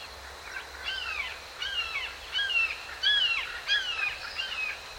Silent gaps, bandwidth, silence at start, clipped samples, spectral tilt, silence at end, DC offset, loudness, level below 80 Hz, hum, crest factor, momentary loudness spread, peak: none; 16.5 kHz; 0 s; under 0.1%; 0.5 dB/octave; 0 s; under 0.1%; -29 LUFS; -56 dBFS; none; 18 dB; 13 LU; -14 dBFS